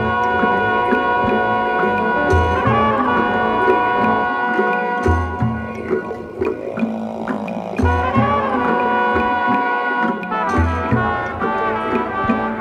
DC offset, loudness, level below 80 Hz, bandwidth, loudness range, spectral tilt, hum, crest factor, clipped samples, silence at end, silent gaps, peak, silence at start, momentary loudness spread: under 0.1%; -18 LUFS; -34 dBFS; 9.4 kHz; 4 LU; -7.5 dB/octave; none; 16 dB; under 0.1%; 0 s; none; -2 dBFS; 0 s; 7 LU